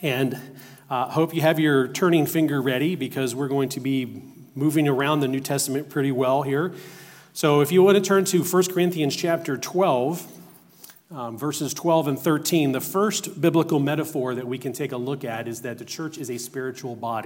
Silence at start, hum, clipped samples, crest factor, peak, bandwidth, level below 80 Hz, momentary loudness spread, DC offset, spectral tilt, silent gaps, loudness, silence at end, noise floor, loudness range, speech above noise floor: 0 s; none; under 0.1%; 18 dB; -4 dBFS; 16.5 kHz; -74 dBFS; 12 LU; under 0.1%; -5 dB/octave; none; -23 LUFS; 0 s; -49 dBFS; 5 LU; 26 dB